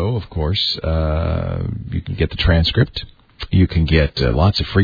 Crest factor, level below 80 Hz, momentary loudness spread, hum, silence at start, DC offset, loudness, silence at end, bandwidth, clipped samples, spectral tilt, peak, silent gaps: 16 dB; -26 dBFS; 9 LU; none; 0 s; under 0.1%; -18 LUFS; 0 s; 5 kHz; under 0.1%; -7.5 dB/octave; -2 dBFS; none